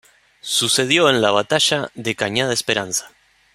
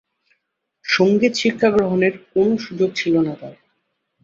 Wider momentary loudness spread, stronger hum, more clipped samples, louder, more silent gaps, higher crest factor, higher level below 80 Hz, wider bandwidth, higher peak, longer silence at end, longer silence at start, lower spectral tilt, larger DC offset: about the same, 10 LU vs 10 LU; neither; neither; about the same, -17 LUFS vs -18 LUFS; neither; about the same, 18 dB vs 18 dB; about the same, -60 dBFS vs -58 dBFS; first, 16 kHz vs 7.8 kHz; about the same, -2 dBFS vs -2 dBFS; second, 0.45 s vs 0.7 s; second, 0.45 s vs 0.85 s; second, -2.5 dB/octave vs -5.5 dB/octave; neither